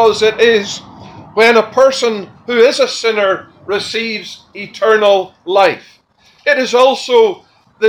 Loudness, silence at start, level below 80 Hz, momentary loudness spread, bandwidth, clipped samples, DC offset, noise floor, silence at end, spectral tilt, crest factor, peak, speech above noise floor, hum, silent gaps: -12 LUFS; 0 s; -58 dBFS; 14 LU; 12 kHz; under 0.1%; under 0.1%; -50 dBFS; 0 s; -3 dB/octave; 14 dB; 0 dBFS; 38 dB; none; none